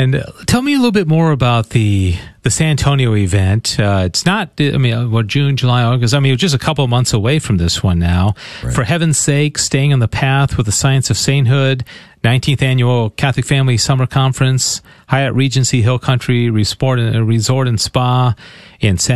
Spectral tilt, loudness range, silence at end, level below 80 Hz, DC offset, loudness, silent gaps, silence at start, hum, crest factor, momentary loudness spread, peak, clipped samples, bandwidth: -5 dB/octave; 1 LU; 0 s; -34 dBFS; 0.7%; -14 LUFS; none; 0 s; none; 12 dB; 4 LU; 0 dBFS; under 0.1%; 13 kHz